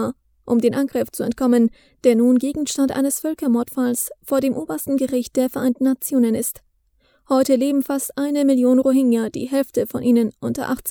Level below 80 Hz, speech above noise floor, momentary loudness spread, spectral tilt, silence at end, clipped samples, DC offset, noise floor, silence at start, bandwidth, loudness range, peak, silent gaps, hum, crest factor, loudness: -56 dBFS; 43 dB; 7 LU; -5 dB/octave; 0 s; under 0.1%; under 0.1%; -61 dBFS; 0 s; over 20 kHz; 2 LU; -2 dBFS; none; none; 16 dB; -20 LUFS